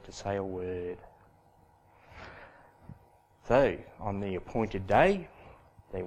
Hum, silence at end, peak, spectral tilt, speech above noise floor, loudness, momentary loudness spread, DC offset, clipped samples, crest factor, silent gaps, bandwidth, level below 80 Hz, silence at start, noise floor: none; 0 s; -8 dBFS; -6.5 dB/octave; 33 dB; -30 LUFS; 24 LU; under 0.1%; under 0.1%; 24 dB; none; 10 kHz; -50 dBFS; 0.05 s; -62 dBFS